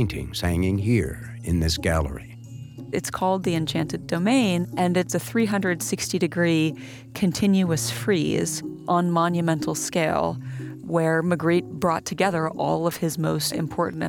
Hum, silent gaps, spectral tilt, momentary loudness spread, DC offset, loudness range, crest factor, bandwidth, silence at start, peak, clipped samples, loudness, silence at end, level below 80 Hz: none; none; -5.5 dB/octave; 9 LU; under 0.1%; 2 LU; 16 dB; 19 kHz; 0 s; -8 dBFS; under 0.1%; -24 LUFS; 0 s; -44 dBFS